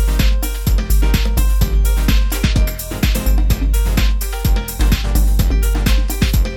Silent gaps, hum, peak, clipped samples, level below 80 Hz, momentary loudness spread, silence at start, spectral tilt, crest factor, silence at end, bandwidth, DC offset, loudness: none; none; -2 dBFS; under 0.1%; -14 dBFS; 3 LU; 0 s; -5 dB/octave; 12 dB; 0 s; 18.5 kHz; under 0.1%; -17 LUFS